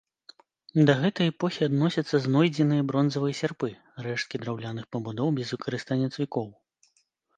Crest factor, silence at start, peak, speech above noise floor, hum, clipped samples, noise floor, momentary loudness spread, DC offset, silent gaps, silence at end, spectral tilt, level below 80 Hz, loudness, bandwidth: 20 dB; 0.75 s; -6 dBFS; 44 dB; none; under 0.1%; -71 dBFS; 12 LU; under 0.1%; none; 0.85 s; -7 dB/octave; -70 dBFS; -27 LUFS; 9.2 kHz